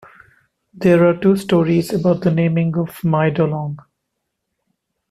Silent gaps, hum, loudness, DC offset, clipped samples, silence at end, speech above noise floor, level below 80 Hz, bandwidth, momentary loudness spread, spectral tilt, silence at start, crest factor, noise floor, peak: none; none; -17 LUFS; under 0.1%; under 0.1%; 1.3 s; 60 dB; -54 dBFS; 14 kHz; 8 LU; -8 dB/octave; 0.75 s; 16 dB; -76 dBFS; -2 dBFS